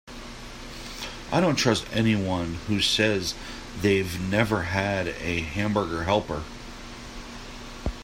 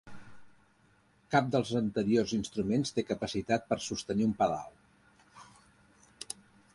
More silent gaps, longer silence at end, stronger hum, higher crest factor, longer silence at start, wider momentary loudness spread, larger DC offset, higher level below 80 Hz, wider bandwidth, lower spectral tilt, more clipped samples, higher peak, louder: neither; second, 0 s vs 0.4 s; neither; about the same, 20 dB vs 22 dB; about the same, 0.05 s vs 0.05 s; about the same, 17 LU vs 15 LU; neither; first, -42 dBFS vs -62 dBFS; first, 16 kHz vs 11.5 kHz; about the same, -4.5 dB/octave vs -5.5 dB/octave; neither; first, -6 dBFS vs -10 dBFS; first, -25 LUFS vs -32 LUFS